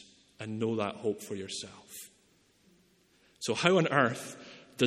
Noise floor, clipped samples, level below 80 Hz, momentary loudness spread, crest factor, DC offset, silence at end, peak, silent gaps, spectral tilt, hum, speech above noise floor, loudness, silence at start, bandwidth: -67 dBFS; under 0.1%; -74 dBFS; 21 LU; 26 dB; under 0.1%; 0 s; -6 dBFS; none; -4.5 dB/octave; none; 36 dB; -31 LUFS; 0.4 s; 16 kHz